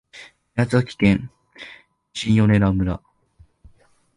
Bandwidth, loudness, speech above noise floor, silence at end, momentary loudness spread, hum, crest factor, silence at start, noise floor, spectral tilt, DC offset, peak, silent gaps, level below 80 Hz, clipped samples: 11 kHz; -20 LUFS; 37 dB; 1.2 s; 23 LU; none; 18 dB; 0.15 s; -55 dBFS; -7 dB/octave; under 0.1%; -4 dBFS; none; -40 dBFS; under 0.1%